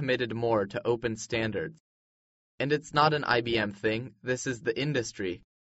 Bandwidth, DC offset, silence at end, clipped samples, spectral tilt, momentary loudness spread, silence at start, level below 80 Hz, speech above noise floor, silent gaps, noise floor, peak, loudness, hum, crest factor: 8 kHz; under 0.1%; 0.25 s; under 0.1%; -3.5 dB/octave; 10 LU; 0 s; -60 dBFS; over 61 dB; 1.80-2.58 s; under -90 dBFS; -8 dBFS; -29 LUFS; none; 22 dB